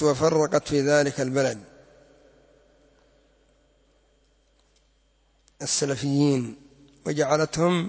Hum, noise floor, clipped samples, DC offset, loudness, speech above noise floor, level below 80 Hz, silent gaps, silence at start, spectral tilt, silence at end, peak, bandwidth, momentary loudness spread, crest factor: none; -64 dBFS; under 0.1%; under 0.1%; -24 LUFS; 41 dB; -58 dBFS; none; 0 s; -5 dB/octave; 0 s; -8 dBFS; 8 kHz; 11 LU; 18 dB